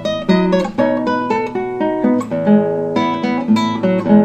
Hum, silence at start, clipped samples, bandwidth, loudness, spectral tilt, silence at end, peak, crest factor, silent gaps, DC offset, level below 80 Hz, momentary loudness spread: none; 0 s; under 0.1%; 8.4 kHz; -16 LUFS; -7.5 dB/octave; 0 s; 0 dBFS; 14 dB; none; under 0.1%; -48 dBFS; 5 LU